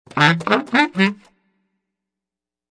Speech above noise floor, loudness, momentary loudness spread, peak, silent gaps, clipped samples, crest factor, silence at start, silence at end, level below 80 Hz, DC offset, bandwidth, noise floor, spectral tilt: 71 dB; -17 LUFS; 4 LU; 0 dBFS; none; under 0.1%; 20 dB; 0.15 s; 1.6 s; -64 dBFS; under 0.1%; 10.5 kHz; -88 dBFS; -5.5 dB/octave